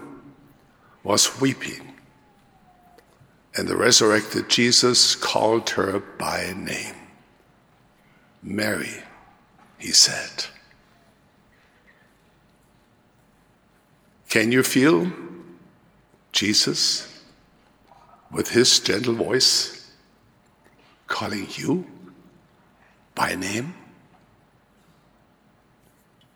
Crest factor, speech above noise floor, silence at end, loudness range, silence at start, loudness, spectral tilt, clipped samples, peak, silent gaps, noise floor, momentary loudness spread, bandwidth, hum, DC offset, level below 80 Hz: 24 dB; 38 dB; 2.6 s; 13 LU; 0 s; -20 LUFS; -2.5 dB/octave; under 0.1%; -2 dBFS; none; -59 dBFS; 19 LU; over 20 kHz; none; under 0.1%; -66 dBFS